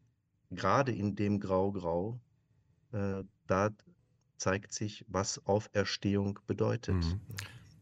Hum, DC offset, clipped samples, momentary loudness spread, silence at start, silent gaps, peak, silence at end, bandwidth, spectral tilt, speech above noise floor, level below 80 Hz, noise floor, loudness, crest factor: none; under 0.1%; under 0.1%; 11 LU; 0.5 s; none; -14 dBFS; 0.2 s; 13 kHz; -5.5 dB/octave; 40 dB; -56 dBFS; -73 dBFS; -34 LUFS; 20 dB